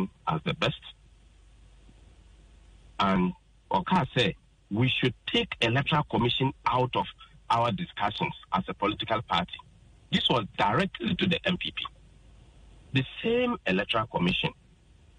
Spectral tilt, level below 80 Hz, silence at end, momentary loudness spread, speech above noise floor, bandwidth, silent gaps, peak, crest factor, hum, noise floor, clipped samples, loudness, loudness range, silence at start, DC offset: -6 dB/octave; -52 dBFS; 0.65 s; 7 LU; 30 dB; 10 kHz; none; -12 dBFS; 18 dB; none; -57 dBFS; under 0.1%; -28 LUFS; 4 LU; 0 s; under 0.1%